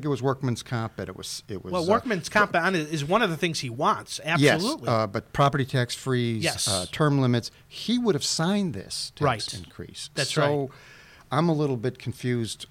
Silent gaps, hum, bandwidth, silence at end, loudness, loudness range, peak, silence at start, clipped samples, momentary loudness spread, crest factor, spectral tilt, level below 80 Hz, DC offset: none; none; 16.5 kHz; 0.05 s; -25 LUFS; 4 LU; -8 dBFS; 0 s; under 0.1%; 11 LU; 18 dB; -4.5 dB/octave; -56 dBFS; under 0.1%